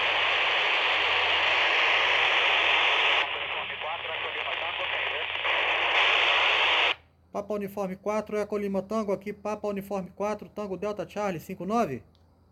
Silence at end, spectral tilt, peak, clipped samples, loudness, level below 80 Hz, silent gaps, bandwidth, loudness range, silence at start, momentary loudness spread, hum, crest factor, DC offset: 0.5 s; -3 dB/octave; -10 dBFS; under 0.1%; -25 LUFS; -62 dBFS; none; 16.5 kHz; 10 LU; 0 s; 12 LU; none; 16 dB; under 0.1%